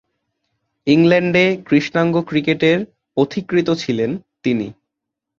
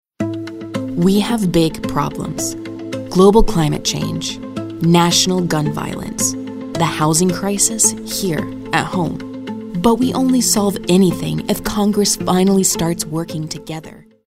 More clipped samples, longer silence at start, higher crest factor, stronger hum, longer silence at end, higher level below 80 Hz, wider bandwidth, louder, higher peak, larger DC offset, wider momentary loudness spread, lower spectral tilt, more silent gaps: neither; first, 0.85 s vs 0.2 s; about the same, 16 dB vs 16 dB; neither; first, 0.65 s vs 0.25 s; second, -56 dBFS vs -34 dBFS; second, 7.4 kHz vs 16 kHz; about the same, -17 LUFS vs -16 LUFS; about the same, -2 dBFS vs 0 dBFS; neither; second, 10 LU vs 13 LU; first, -6.5 dB/octave vs -4.5 dB/octave; neither